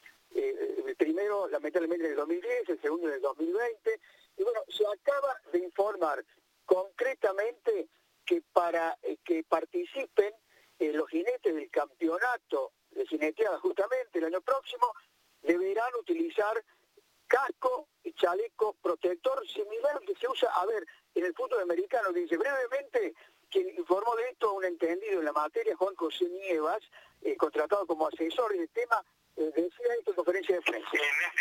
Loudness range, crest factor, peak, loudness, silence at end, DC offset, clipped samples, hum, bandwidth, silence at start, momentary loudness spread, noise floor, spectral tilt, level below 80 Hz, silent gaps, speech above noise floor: 1 LU; 22 dB; -8 dBFS; -32 LUFS; 0 s; under 0.1%; under 0.1%; none; 16.5 kHz; 0.3 s; 6 LU; -67 dBFS; -3 dB/octave; -82 dBFS; none; 35 dB